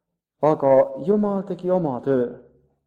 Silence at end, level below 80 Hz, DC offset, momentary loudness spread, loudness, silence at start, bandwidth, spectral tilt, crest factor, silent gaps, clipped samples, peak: 0.45 s; -64 dBFS; under 0.1%; 7 LU; -21 LUFS; 0.4 s; 6.8 kHz; -10 dB/octave; 16 dB; none; under 0.1%; -6 dBFS